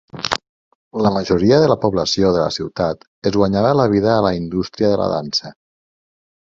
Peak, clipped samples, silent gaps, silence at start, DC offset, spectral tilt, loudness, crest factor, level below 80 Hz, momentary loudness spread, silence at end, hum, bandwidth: 0 dBFS; under 0.1%; 0.49-0.91 s, 3.07-3.22 s; 0.15 s; under 0.1%; -6 dB/octave; -17 LUFS; 18 dB; -44 dBFS; 9 LU; 1 s; none; 7.8 kHz